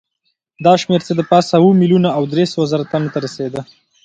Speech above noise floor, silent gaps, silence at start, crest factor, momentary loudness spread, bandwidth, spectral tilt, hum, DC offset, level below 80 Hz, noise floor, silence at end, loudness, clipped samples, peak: 55 dB; none; 0.6 s; 14 dB; 12 LU; 8.8 kHz; -7 dB/octave; none; under 0.1%; -58 dBFS; -69 dBFS; 0.4 s; -15 LUFS; under 0.1%; 0 dBFS